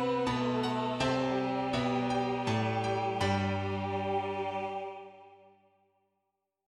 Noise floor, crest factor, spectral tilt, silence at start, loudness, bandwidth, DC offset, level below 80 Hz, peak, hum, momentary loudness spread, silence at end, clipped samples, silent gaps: -83 dBFS; 16 dB; -6 dB/octave; 0 s; -32 LUFS; 12 kHz; under 0.1%; -60 dBFS; -16 dBFS; none; 6 LU; 1.4 s; under 0.1%; none